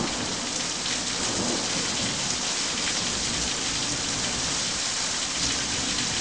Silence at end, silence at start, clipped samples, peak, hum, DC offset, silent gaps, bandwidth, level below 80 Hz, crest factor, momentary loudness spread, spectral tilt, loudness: 0 s; 0 s; under 0.1%; -10 dBFS; none; 0.2%; none; 11 kHz; -48 dBFS; 16 dB; 2 LU; -1 dB/octave; -25 LUFS